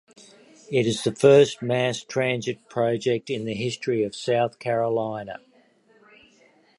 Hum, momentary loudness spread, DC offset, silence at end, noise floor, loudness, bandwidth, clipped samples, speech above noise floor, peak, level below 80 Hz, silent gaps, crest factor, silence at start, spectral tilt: none; 12 LU; under 0.1%; 1.4 s; -59 dBFS; -23 LUFS; 11.5 kHz; under 0.1%; 36 dB; -4 dBFS; -66 dBFS; none; 22 dB; 0.7 s; -5.5 dB/octave